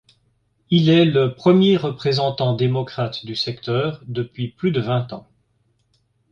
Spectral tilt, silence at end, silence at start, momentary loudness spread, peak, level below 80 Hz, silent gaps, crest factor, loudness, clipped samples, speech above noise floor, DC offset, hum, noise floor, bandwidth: -8 dB/octave; 1.1 s; 0.7 s; 12 LU; -4 dBFS; -56 dBFS; none; 18 dB; -19 LUFS; under 0.1%; 46 dB; under 0.1%; none; -65 dBFS; 7.2 kHz